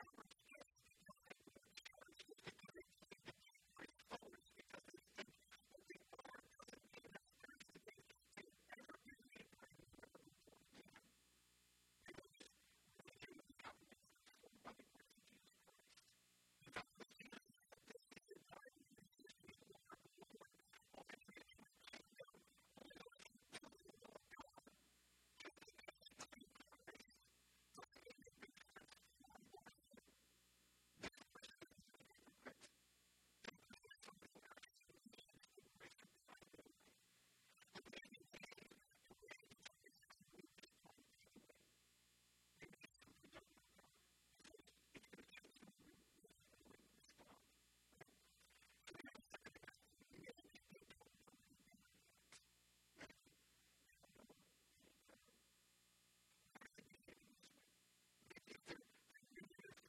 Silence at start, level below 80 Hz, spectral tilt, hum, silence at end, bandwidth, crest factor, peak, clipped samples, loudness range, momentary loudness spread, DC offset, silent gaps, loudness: 0 s; -88 dBFS; -3 dB/octave; none; 0 s; 15 kHz; 28 dB; -38 dBFS; under 0.1%; 6 LU; 9 LU; under 0.1%; none; -64 LUFS